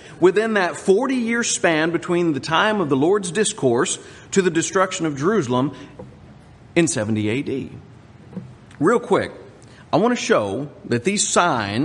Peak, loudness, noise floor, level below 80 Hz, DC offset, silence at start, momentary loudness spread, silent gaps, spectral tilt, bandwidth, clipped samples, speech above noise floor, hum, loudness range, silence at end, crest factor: -2 dBFS; -20 LUFS; -45 dBFS; -58 dBFS; under 0.1%; 0 s; 10 LU; none; -4 dB/octave; 11 kHz; under 0.1%; 25 dB; none; 5 LU; 0 s; 18 dB